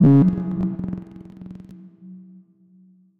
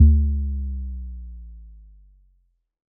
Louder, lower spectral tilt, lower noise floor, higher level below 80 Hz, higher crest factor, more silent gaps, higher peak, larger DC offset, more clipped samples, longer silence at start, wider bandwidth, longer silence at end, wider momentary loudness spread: first, -21 LUFS vs -25 LUFS; second, -12 dB/octave vs -25 dB/octave; second, -53 dBFS vs -65 dBFS; second, -48 dBFS vs -24 dBFS; about the same, 16 dB vs 18 dB; neither; about the same, -6 dBFS vs -4 dBFS; neither; neither; about the same, 0 s vs 0 s; first, 3.5 kHz vs 0.5 kHz; second, 1 s vs 1.25 s; first, 27 LU vs 24 LU